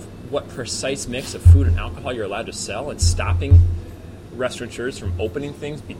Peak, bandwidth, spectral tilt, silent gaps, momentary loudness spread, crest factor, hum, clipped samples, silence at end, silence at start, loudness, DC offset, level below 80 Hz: -2 dBFS; 11.5 kHz; -5.5 dB/octave; none; 15 LU; 18 dB; none; under 0.1%; 0 s; 0 s; -21 LUFS; under 0.1%; -26 dBFS